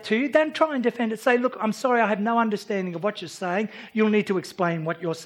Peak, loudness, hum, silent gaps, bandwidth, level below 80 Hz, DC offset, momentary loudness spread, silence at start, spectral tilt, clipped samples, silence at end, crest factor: -6 dBFS; -24 LUFS; none; none; 15.5 kHz; -78 dBFS; under 0.1%; 7 LU; 0 s; -6 dB/octave; under 0.1%; 0 s; 18 dB